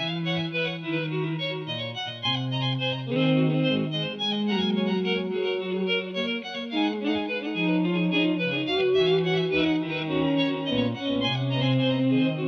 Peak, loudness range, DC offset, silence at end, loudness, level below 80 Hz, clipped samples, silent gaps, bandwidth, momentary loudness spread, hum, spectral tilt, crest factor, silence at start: -12 dBFS; 3 LU; under 0.1%; 0 s; -25 LUFS; -60 dBFS; under 0.1%; none; 6.6 kHz; 6 LU; none; -7 dB/octave; 14 dB; 0 s